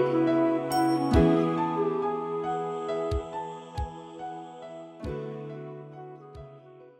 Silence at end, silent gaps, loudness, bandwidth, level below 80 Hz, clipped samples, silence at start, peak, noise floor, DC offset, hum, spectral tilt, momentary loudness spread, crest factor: 0.1 s; none; -28 LUFS; 16 kHz; -42 dBFS; under 0.1%; 0 s; -8 dBFS; -50 dBFS; under 0.1%; none; -7 dB/octave; 20 LU; 20 dB